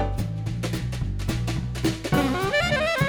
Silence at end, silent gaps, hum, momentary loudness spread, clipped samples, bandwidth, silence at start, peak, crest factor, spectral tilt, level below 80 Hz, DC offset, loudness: 0 s; none; none; 7 LU; under 0.1%; over 20 kHz; 0 s; -10 dBFS; 16 dB; -5.5 dB/octave; -34 dBFS; under 0.1%; -26 LUFS